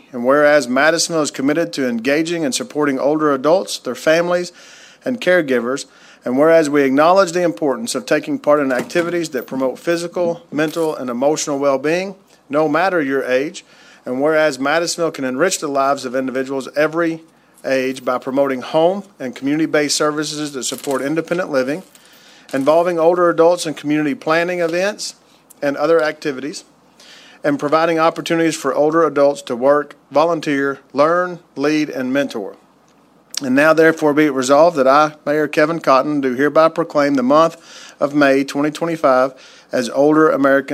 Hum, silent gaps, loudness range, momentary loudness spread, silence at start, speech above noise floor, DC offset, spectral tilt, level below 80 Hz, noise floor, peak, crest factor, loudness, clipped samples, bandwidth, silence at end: none; none; 5 LU; 10 LU; 0.15 s; 36 dB; under 0.1%; -4.5 dB/octave; -70 dBFS; -52 dBFS; 0 dBFS; 16 dB; -16 LUFS; under 0.1%; 16 kHz; 0 s